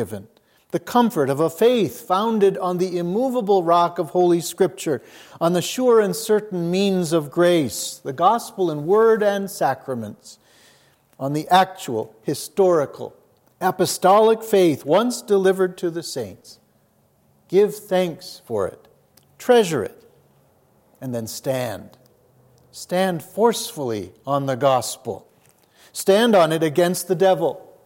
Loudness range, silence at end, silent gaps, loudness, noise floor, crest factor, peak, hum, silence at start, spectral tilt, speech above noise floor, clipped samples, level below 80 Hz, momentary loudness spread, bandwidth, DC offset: 6 LU; 0.25 s; none; -20 LUFS; -61 dBFS; 18 dB; -4 dBFS; none; 0 s; -5 dB/octave; 41 dB; under 0.1%; -70 dBFS; 13 LU; 17 kHz; under 0.1%